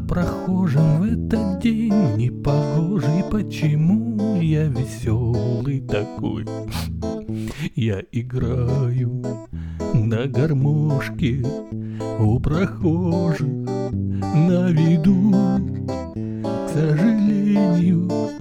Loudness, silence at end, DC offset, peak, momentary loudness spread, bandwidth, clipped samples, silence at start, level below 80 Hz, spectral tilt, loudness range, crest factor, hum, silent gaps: -21 LUFS; 0 s; under 0.1%; -6 dBFS; 10 LU; 13 kHz; under 0.1%; 0 s; -38 dBFS; -8.5 dB/octave; 5 LU; 14 dB; none; none